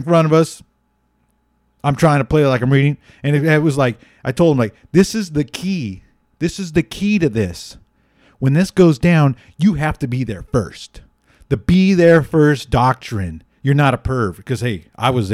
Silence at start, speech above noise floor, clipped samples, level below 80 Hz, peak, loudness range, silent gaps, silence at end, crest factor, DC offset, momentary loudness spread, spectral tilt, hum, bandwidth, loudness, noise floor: 0 s; 48 dB; under 0.1%; -38 dBFS; -2 dBFS; 4 LU; none; 0 s; 14 dB; under 0.1%; 11 LU; -7 dB/octave; none; 14.5 kHz; -16 LUFS; -63 dBFS